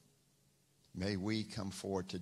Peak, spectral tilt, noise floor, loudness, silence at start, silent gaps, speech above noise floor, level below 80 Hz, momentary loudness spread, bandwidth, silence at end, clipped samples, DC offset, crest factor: -24 dBFS; -5.5 dB/octave; -73 dBFS; -40 LUFS; 0.95 s; none; 34 dB; -68 dBFS; 5 LU; 14.5 kHz; 0 s; under 0.1%; under 0.1%; 18 dB